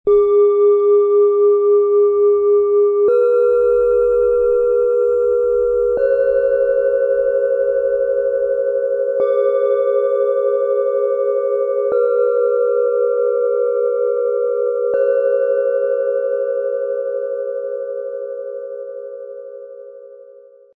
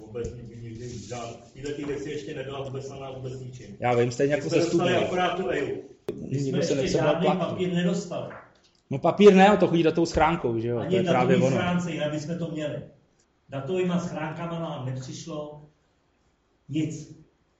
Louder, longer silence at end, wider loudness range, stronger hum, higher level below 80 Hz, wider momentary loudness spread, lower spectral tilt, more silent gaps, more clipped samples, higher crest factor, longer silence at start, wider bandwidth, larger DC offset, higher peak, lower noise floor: first, -16 LUFS vs -25 LUFS; about the same, 0.45 s vs 0.45 s; second, 8 LU vs 13 LU; neither; about the same, -50 dBFS vs -52 dBFS; second, 12 LU vs 16 LU; first, -7.5 dB/octave vs -6 dB/octave; neither; neither; second, 10 dB vs 20 dB; about the same, 0.05 s vs 0 s; second, 3.7 kHz vs 8.2 kHz; neither; about the same, -6 dBFS vs -6 dBFS; second, -43 dBFS vs -67 dBFS